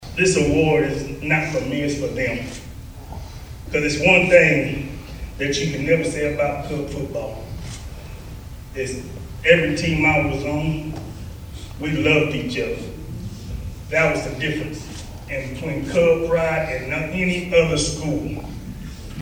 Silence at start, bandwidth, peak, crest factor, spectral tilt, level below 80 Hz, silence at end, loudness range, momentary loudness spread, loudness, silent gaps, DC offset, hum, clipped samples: 0 s; 17 kHz; 0 dBFS; 22 dB; -5 dB/octave; -36 dBFS; 0 s; 6 LU; 19 LU; -20 LUFS; none; under 0.1%; none; under 0.1%